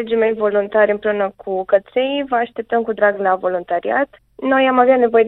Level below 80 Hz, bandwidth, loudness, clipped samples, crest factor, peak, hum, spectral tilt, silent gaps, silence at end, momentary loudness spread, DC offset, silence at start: -58 dBFS; 4.1 kHz; -17 LUFS; under 0.1%; 16 dB; -2 dBFS; none; -8.5 dB/octave; none; 0 s; 8 LU; under 0.1%; 0 s